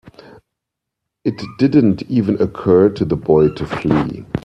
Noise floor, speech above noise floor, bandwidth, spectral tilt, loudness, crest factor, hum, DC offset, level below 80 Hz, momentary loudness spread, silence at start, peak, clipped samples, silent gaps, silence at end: -80 dBFS; 65 dB; 8.2 kHz; -9 dB/octave; -16 LUFS; 16 dB; none; under 0.1%; -44 dBFS; 10 LU; 1.25 s; 0 dBFS; under 0.1%; none; 0.05 s